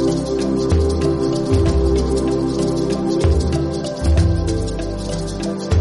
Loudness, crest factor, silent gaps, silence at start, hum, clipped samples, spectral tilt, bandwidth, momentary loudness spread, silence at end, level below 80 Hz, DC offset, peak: -19 LUFS; 12 dB; none; 0 s; none; under 0.1%; -7 dB/octave; 11.5 kHz; 7 LU; 0 s; -24 dBFS; under 0.1%; -6 dBFS